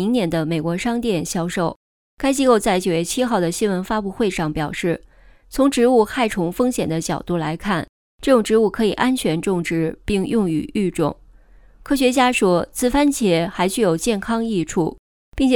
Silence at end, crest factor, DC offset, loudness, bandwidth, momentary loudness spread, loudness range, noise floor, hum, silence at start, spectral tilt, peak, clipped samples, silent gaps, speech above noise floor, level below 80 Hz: 0 s; 16 dB; under 0.1%; -20 LUFS; 19 kHz; 8 LU; 2 LU; -48 dBFS; none; 0 s; -5 dB/octave; -2 dBFS; under 0.1%; 1.76-2.17 s, 7.89-8.18 s, 14.99-15.32 s; 29 dB; -42 dBFS